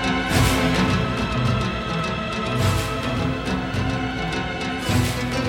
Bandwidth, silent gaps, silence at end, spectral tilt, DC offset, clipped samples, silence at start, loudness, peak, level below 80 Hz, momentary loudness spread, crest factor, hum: 17.5 kHz; none; 0 s; -5 dB/octave; under 0.1%; under 0.1%; 0 s; -22 LUFS; -6 dBFS; -34 dBFS; 6 LU; 16 dB; none